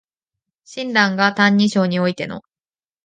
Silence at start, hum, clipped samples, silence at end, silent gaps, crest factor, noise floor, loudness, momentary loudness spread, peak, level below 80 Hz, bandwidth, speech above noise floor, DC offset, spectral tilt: 0.7 s; none; under 0.1%; 0.65 s; none; 18 dB; under -90 dBFS; -17 LUFS; 15 LU; -2 dBFS; -64 dBFS; 9.2 kHz; over 73 dB; under 0.1%; -5.5 dB/octave